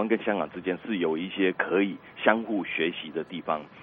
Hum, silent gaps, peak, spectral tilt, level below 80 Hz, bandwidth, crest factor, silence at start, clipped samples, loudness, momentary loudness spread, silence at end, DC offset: none; none; -4 dBFS; -9 dB/octave; -70 dBFS; 4.3 kHz; 24 dB; 0 s; under 0.1%; -28 LUFS; 8 LU; 0 s; under 0.1%